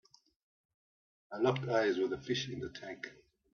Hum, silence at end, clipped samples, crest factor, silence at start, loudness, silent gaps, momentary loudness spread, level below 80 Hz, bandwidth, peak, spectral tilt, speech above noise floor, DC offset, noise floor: none; 0.4 s; under 0.1%; 22 dB; 1.3 s; -35 LUFS; none; 16 LU; -72 dBFS; 6.8 kHz; -16 dBFS; -4 dB/octave; over 55 dB; under 0.1%; under -90 dBFS